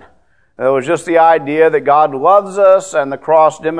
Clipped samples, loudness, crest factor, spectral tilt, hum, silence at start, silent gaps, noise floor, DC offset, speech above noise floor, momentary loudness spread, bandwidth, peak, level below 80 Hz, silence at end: 0.1%; -12 LUFS; 12 dB; -5 dB/octave; none; 0.6 s; none; -54 dBFS; 0.3%; 43 dB; 6 LU; 10.5 kHz; 0 dBFS; -58 dBFS; 0 s